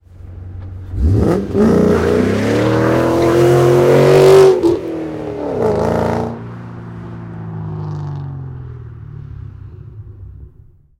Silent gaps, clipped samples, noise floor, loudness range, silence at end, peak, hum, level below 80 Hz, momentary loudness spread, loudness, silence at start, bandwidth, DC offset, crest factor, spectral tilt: none; under 0.1%; -44 dBFS; 17 LU; 0.5 s; 0 dBFS; none; -32 dBFS; 23 LU; -13 LUFS; 0.2 s; 16 kHz; under 0.1%; 14 dB; -7.5 dB/octave